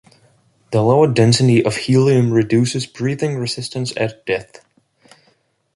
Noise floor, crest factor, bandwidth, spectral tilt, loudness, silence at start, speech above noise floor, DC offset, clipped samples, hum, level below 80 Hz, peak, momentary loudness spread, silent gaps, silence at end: -61 dBFS; 16 dB; 11.5 kHz; -6 dB/octave; -16 LUFS; 0.7 s; 45 dB; under 0.1%; under 0.1%; none; -54 dBFS; -2 dBFS; 10 LU; none; 1.35 s